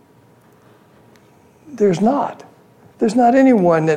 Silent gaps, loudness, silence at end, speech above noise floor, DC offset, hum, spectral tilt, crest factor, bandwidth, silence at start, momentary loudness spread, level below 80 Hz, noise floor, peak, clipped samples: none; -15 LUFS; 0 s; 36 dB; under 0.1%; none; -7.5 dB/octave; 14 dB; 10 kHz; 1.7 s; 9 LU; -62 dBFS; -50 dBFS; -2 dBFS; under 0.1%